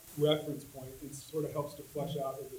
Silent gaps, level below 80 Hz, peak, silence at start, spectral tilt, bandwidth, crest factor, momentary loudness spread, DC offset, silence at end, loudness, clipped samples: none; -64 dBFS; -14 dBFS; 0 s; -5.5 dB/octave; 17 kHz; 22 dB; 15 LU; under 0.1%; 0 s; -37 LUFS; under 0.1%